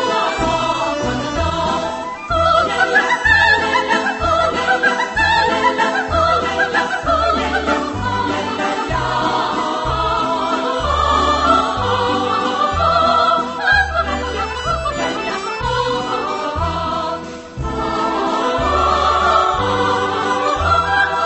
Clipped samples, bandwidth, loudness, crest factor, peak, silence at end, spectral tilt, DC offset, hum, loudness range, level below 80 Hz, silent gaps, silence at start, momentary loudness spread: under 0.1%; 8.6 kHz; -16 LUFS; 16 dB; 0 dBFS; 0 s; -4 dB/octave; under 0.1%; none; 5 LU; -32 dBFS; none; 0 s; 7 LU